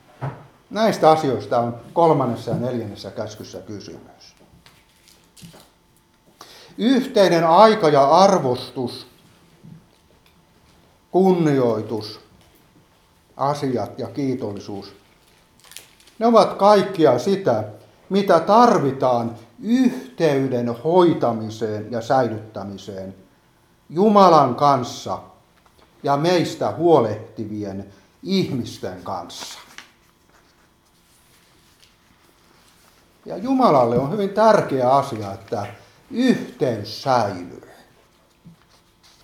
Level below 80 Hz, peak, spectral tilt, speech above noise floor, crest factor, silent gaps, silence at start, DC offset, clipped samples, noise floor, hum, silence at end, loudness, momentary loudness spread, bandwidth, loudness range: -62 dBFS; 0 dBFS; -6.5 dB/octave; 39 dB; 20 dB; none; 0.2 s; under 0.1%; under 0.1%; -58 dBFS; none; 0.75 s; -19 LUFS; 19 LU; 16 kHz; 12 LU